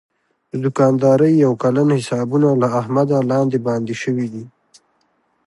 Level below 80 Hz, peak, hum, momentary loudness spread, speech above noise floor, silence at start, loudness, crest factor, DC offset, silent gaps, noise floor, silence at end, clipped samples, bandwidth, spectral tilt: -64 dBFS; -2 dBFS; none; 10 LU; 48 dB; 0.55 s; -17 LUFS; 14 dB; under 0.1%; none; -64 dBFS; 1 s; under 0.1%; 11.5 kHz; -8 dB/octave